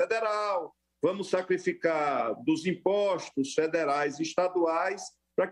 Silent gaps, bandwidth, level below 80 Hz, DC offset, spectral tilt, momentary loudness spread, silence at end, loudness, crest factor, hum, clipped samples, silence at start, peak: none; 11.5 kHz; -76 dBFS; under 0.1%; -5 dB/octave; 4 LU; 0 s; -29 LUFS; 16 dB; none; under 0.1%; 0 s; -12 dBFS